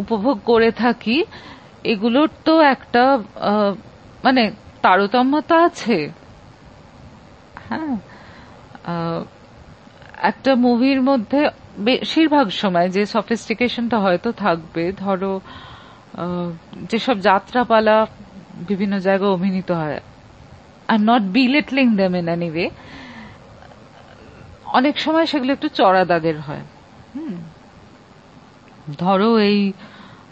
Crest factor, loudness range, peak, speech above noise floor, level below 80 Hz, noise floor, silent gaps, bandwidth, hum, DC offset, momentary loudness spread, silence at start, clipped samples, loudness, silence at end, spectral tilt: 20 dB; 6 LU; 0 dBFS; 28 dB; -54 dBFS; -45 dBFS; none; 8.4 kHz; none; under 0.1%; 17 LU; 0 s; under 0.1%; -18 LUFS; 0.25 s; -6.5 dB/octave